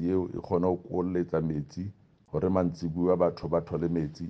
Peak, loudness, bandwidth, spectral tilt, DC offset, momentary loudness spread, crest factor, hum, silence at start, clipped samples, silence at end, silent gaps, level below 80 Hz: -10 dBFS; -29 LUFS; 6.6 kHz; -9.5 dB/octave; under 0.1%; 8 LU; 18 dB; none; 0 s; under 0.1%; 0 s; none; -54 dBFS